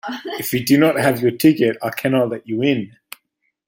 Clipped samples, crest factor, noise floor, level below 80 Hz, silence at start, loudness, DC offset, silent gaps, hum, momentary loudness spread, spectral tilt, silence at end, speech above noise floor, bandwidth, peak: under 0.1%; 16 dB; -70 dBFS; -58 dBFS; 0.05 s; -18 LUFS; under 0.1%; none; none; 10 LU; -5.5 dB/octave; 0.8 s; 52 dB; 16.5 kHz; -2 dBFS